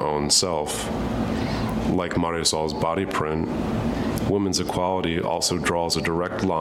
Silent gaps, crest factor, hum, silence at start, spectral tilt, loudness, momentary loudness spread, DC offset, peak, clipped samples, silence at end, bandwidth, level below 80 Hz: none; 16 dB; none; 0 s; -4 dB/octave; -23 LUFS; 6 LU; under 0.1%; -6 dBFS; under 0.1%; 0 s; 16.5 kHz; -40 dBFS